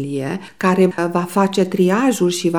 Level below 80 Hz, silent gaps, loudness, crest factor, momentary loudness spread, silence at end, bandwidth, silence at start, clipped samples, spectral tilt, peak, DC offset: -64 dBFS; none; -17 LUFS; 14 dB; 8 LU; 0 s; 18.5 kHz; 0 s; under 0.1%; -5.5 dB/octave; -2 dBFS; 0.3%